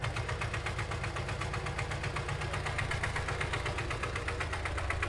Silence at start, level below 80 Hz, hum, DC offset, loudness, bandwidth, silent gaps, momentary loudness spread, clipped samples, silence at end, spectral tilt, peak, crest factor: 0 s; -44 dBFS; none; under 0.1%; -35 LUFS; 11.5 kHz; none; 2 LU; under 0.1%; 0 s; -4.5 dB/octave; -18 dBFS; 18 dB